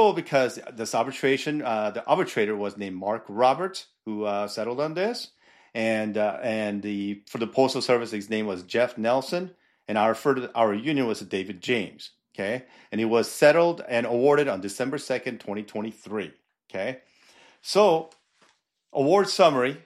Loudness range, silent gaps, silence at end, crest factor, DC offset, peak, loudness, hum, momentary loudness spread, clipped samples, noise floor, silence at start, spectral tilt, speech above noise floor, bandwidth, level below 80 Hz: 5 LU; none; 0.1 s; 22 dB; under 0.1%; -4 dBFS; -25 LUFS; none; 14 LU; under 0.1%; -65 dBFS; 0 s; -5 dB/octave; 40 dB; 14.5 kHz; -76 dBFS